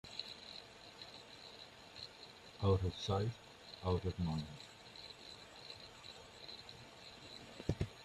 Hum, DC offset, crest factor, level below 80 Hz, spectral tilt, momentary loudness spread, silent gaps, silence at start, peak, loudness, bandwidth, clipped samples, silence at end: none; under 0.1%; 24 dB; -62 dBFS; -6 dB/octave; 16 LU; none; 0.05 s; -20 dBFS; -44 LUFS; 12.5 kHz; under 0.1%; 0 s